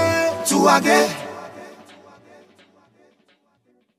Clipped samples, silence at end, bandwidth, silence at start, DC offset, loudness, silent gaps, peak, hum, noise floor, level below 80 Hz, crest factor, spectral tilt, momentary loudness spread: under 0.1%; 2.25 s; 16 kHz; 0 s; under 0.1%; -17 LUFS; none; -2 dBFS; none; -64 dBFS; -64 dBFS; 20 dB; -3.5 dB/octave; 25 LU